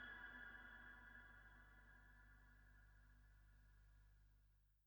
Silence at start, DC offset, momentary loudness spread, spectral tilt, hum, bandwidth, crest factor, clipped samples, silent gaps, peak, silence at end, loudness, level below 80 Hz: 0 s; under 0.1%; 12 LU; -4.5 dB/octave; 50 Hz at -70 dBFS; over 20 kHz; 18 dB; under 0.1%; none; -46 dBFS; 0 s; -62 LUFS; -70 dBFS